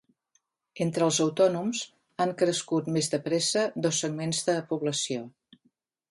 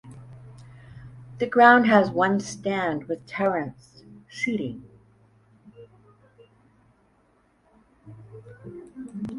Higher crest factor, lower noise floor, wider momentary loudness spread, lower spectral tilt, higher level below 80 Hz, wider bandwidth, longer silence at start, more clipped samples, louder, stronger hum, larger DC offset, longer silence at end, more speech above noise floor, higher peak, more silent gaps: second, 18 dB vs 24 dB; first, -73 dBFS vs -63 dBFS; second, 8 LU vs 30 LU; second, -4 dB/octave vs -5.5 dB/octave; second, -74 dBFS vs -62 dBFS; about the same, 11.5 kHz vs 11.5 kHz; first, 0.75 s vs 0.05 s; neither; second, -27 LUFS vs -22 LUFS; neither; neither; first, 0.8 s vs 0 s; first, 46 dB vs 42 dB; second, -10 dBFS vs -2 dBFS; neither